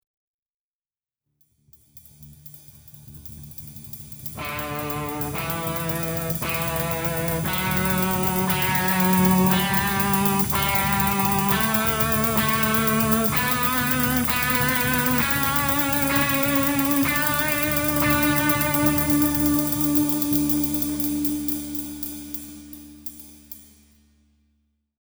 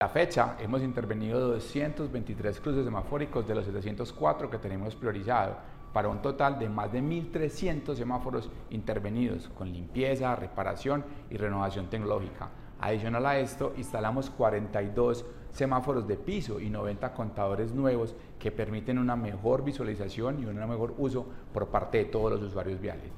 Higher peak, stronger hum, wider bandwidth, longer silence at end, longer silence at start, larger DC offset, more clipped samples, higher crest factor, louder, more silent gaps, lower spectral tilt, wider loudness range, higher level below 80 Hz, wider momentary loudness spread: first, -4 dBFS vs -10 dBFS; neither; first, over 20 kHz vs 14 kHz; first, 1.4 s vs 0 s; first, 1.95 s vs 0 s; neither; neither; about the same, 20 dB vs 22 dB; first, -21 LUFS vs -32 LUFS; neither; second, -4 dB/octave vs -7.5 dB/octave; first, 12 LU vs 2 LU; about the same, -42 dBFS vs -46 dBFS; first, 16 LU vs 8 LU